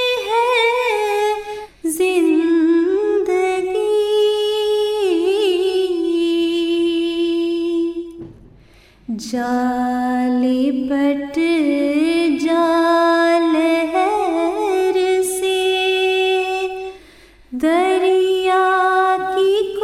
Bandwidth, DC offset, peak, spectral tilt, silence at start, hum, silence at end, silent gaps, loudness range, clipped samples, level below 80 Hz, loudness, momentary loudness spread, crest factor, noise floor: 15 kHz; under 0.1%; -4 dBFS; -3 dB/octave; 0 s; none; 0 s; none; 5 LU; under 0.1%; -54 dBFS; -17 LUFS; 7 LU; 12 dB; -48 dBFS